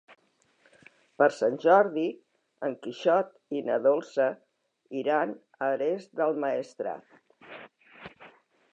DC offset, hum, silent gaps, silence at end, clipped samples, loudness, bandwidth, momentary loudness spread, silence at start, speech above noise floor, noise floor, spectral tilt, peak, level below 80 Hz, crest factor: under 0.1%; none; none; 0.45 s; under 0.1%; -28 LUFS; 8.8 kHz; 24 LU; 1.2 s; 39 dB; -66 dBFS; -6 dB/octave; -8 dBFS; -80 dBFS; 22 dB